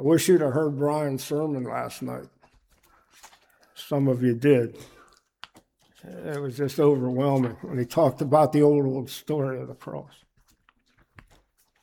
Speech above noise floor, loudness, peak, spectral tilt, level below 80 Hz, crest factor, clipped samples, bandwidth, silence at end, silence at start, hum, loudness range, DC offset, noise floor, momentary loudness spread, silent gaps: 40 dB; -24 LUFS; -6 dBFS; -7 dB/octave; -66 dBFS; 18 dB; under 0.1%; 19 kHz; 1.8 s; 0 s; none; 7 LU; under 0.1%; -64 dBFS; 16 LU; none